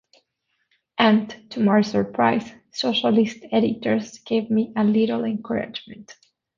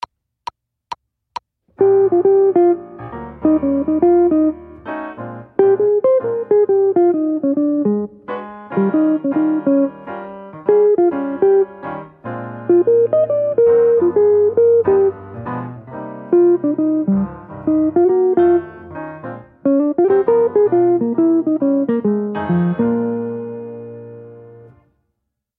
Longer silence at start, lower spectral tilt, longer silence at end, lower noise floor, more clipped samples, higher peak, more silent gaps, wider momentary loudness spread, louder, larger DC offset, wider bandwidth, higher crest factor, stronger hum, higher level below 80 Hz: about the same, 1 s vs 0.9 s; second, -6 dB/octave vs -10.5 dB/octave; second, 0.45 s vs 1.15 s; about the same, -73 dBFS vs -74 dBFS; neither; about the same, -2 dBFS vs 0 dBFS; neither; second, 13 LU vs 18 LU; second, -21 LUFS vs -15 LUFS; neither; first, 7.4 kHz vs 4.6 kHz; about the same, 20 dB vs 16 dB; neither; second, -62 dBFS vs -52 dBFS